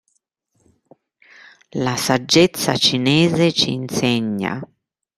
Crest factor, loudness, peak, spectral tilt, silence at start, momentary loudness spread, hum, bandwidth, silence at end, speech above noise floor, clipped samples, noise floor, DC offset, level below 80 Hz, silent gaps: 18 dB; -17 LUFS; -2 dBFS; -4.5 dB/octave; 1.75 s; 10 LU; none; 15.5 kHz; 0.55 s; 51 dB; under 0.1%; -69 dBFS; under 0.1%; -56 dBFS; none